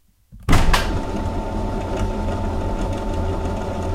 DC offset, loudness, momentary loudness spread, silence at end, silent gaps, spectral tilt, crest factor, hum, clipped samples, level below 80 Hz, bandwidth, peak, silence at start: under 0.1%; -23 LUFS; 7 LU; 0 s; none; -5.5 dB/octave; 20 dB; none; under 0.1%; -24 dBFS; 15 kHz; 0 dBFS; 0.3 s